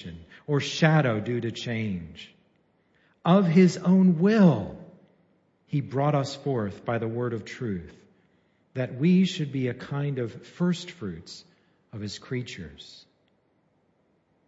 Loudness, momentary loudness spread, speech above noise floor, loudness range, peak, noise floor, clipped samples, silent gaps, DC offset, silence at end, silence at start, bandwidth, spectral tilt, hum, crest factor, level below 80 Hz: -25 LUFS; 22 LU; 43 dB; 12 LU; -8 dBFS; -68 dBFS; under 0.1%; none; under 0.1%; 1.6 s; 0 s; 8 kHz; -7 dB/octave; none; 20 dB; -62 dBFS